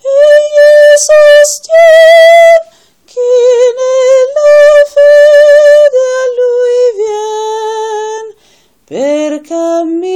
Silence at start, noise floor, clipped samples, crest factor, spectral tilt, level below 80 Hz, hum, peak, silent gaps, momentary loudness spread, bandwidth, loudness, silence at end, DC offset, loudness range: 0.05 s; -48 dBFS; 4%; 6 dB; -0.5 dB/octave; -52 dBFS; none; 0 dBFS; none; 13 LU; 13 kHz; -5 LUFS; 0 s; under 0.1%; 9 LU